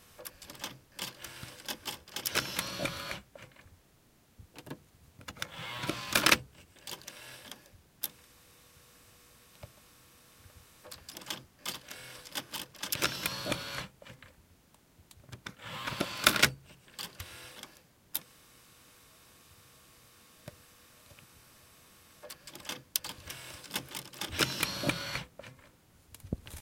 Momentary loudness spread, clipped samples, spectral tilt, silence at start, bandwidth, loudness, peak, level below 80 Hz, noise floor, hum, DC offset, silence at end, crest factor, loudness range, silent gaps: 25 LU; under 0.1%; -2 dB/octave; 0 s; 17 kHz; -34 LUFS; -4 dBFS; -60 dBFS; -65 dBFS; none; under 0.1%; 0 s; 36 dB; 16 LU; none